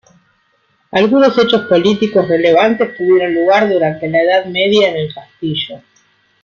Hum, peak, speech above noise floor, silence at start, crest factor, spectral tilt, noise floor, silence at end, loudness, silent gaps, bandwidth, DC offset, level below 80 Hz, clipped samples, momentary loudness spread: none; -2 dBFS; 46 dB; 0.95 s; 12 dB; -6 dB/octave; -59 dBFS; 0.65 s; -12 LUFS; none; 7.2 kHz; under 0.1%; -56 dBFS; under 0.1%; 10 LU